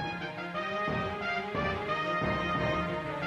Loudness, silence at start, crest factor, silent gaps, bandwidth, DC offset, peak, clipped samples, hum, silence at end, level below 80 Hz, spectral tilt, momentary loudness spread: -32 LUFS; 0 s; 14 dB; none; 13 kHz; under 0.1%; -18 dBFS; under 0.1%; none; 0 s; -50 dBFS; -6.5 dB/octave; 5 LU